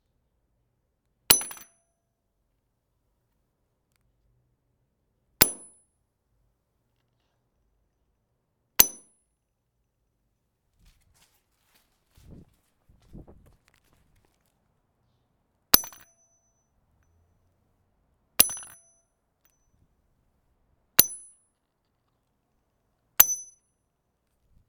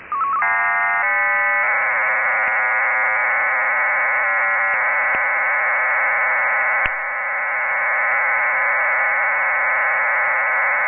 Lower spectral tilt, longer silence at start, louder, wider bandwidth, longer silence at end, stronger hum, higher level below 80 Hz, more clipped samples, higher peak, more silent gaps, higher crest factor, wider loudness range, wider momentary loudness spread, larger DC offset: first, 0 dB/octave vs 8 dB/octave; first, 1.3 s vs 0 s; second, -21 LUFS vs -17 LUFS; first, 19 kHz vs 3.3 kHz; first, 1.25 s vs 0 s; neither; about the same, -58 dBFS vs -56 dBFS; neither; about the same, 0 dBFS vs -2 dBFS; neither; first, 34 dB vs 16 dB; first, 4 LU vs 1 LU; first, 20 LU vs 2 LU; neither